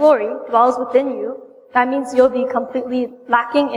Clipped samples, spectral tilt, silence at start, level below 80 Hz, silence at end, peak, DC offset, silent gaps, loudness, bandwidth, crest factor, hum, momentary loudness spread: under 0.1%; -4.5 dB/octave; 0 s; -60 dBFS; 0 s; -2 dBFS; under 0.1%; none; -17 LUFS; 11 kHz; 16 dB; none; 8 LU